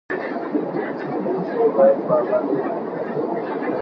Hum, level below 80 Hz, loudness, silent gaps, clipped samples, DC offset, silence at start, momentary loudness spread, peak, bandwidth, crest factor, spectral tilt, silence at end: none; -70 dBFS; -21 LUFS; none; under 0.1%; under 0.1%; 0.1 s; 10 LU; -6 dBFS; 5.6 kHz; 16 dB; -9.5 dB/octave; 0 s